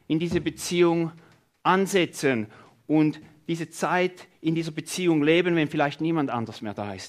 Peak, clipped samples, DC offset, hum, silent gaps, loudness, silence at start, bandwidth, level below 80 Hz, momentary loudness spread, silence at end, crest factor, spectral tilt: -8 dBFS; under 0.1%; under 0.1%; none; none; -25 LUFS; 0.1 s; 15.5 kHz; -62 dBFS; 11 LU; 0 s; 18 dB; -5.5 dB/octave